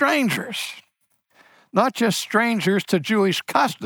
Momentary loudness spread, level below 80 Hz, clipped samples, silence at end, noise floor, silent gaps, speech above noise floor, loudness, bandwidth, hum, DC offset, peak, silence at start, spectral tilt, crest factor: 9 LU; -72 dBFS; under 0.1%; 0 s; -68 dBFS; none; 47 dB; -21 LUFS; 19.5 kHz; none; under 0.1%; -4 dBFS; 0 s; -4.5 dB/octave; 18 dB